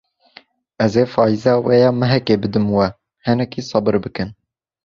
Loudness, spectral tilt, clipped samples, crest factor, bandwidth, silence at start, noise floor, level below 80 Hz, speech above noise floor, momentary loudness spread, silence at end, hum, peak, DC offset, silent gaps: -17 LUFS; -7.5 dB/octave; under 0.1%; 16 dB; 7.4 kHz; 0.8 s; -48 dBFS; -48 dBFS; 32 dB; 9 LU; 0.55 s; none; -2 dBFS; under 0.1%; none